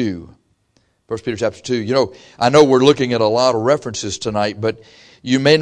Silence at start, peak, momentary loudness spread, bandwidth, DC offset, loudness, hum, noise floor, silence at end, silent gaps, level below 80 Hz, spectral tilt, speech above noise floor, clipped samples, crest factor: 0 s; 0 dBFS; 14 LU; 10.5 kHz; under 0.1%; -16 LUFS; none; -62 dBFS; 0 s; none; -52 dBFS; -5 dB/octave; 45 dB; under 0.1%; 16 dB